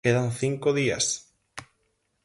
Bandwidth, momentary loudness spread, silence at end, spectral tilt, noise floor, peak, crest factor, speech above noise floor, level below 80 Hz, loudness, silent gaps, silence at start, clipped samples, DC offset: 11.5 kHz; 20 LU; 0.6 s; -4 dB/octave; -73 dBFS; -8 dBFS; 20 dB; 48 dB; -60 dBFS; -26 LUFS; none; 0.05 s; under 0.1%; under 0.1%